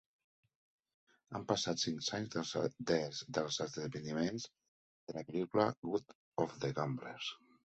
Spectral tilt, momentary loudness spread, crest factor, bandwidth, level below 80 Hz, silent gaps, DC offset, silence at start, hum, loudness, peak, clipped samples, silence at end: -4.5 dB/octave; 12 LU; 22 dB; 8.2 kHz; -74 dBFS; 4.68-5.07 s, 5.78-5.83 s, 6.15-6.32 s; under 0.1%; 1.3 s; none; -39 LUFS; -18 dBFS; under 0.1%; 0.4 s